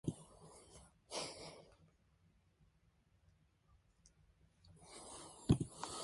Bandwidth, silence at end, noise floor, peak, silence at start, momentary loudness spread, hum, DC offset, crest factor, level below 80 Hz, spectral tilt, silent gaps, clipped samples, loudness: 11.5 kHz; 0 s; -75 dBFS; -18 dBFS; 0.05 s; 24 LU; none; under 0.1%; 30 dB; -60 dBFS; -5.5 dB/octave; none; under 0.1%; -43 LUFS